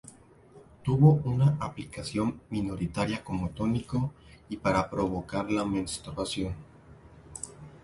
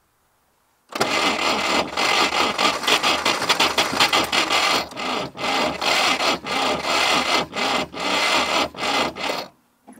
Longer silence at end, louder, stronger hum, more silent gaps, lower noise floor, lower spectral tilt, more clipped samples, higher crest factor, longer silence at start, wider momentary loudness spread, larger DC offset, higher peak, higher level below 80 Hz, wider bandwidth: about the same, 0.05 s vs 0.05 s; second, -29 LUFS vs -19 LUFS; neither; neither; second, -54 dBFS vs -64 dBFS; first, -6.5 dB/octave vs -1.5 dB/octave; neither; about the same, 22 dB vs 20 dB; second, 0.05 s vs 0.9 s; first, 17 LU vs 8 LU; neither; second, -8 dBFS vs -2 dBFS; about the same, -50 dBFS vs -54 dBFS; second, 11.5 kHz vs 16 kHz